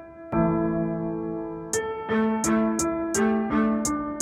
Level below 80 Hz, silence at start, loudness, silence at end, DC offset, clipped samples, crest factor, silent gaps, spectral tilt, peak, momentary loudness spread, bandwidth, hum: -48 dBFS; 0 s; -25 LUFS; 0 s; under 0.1%; under 0.1%; 14 dB; none; -5 dB/octave; -10 dBFS; 7 LU; 15 kHz; none